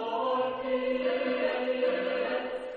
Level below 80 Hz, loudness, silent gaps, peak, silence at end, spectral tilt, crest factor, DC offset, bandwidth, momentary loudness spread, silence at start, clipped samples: -64 dBFS; -30 LUFS; none; -16 dBFS; 0 s; -6 dB/octave; 14 dB; under 0.1%; 5 kHz; 2 LU; 0 s; under 0.1%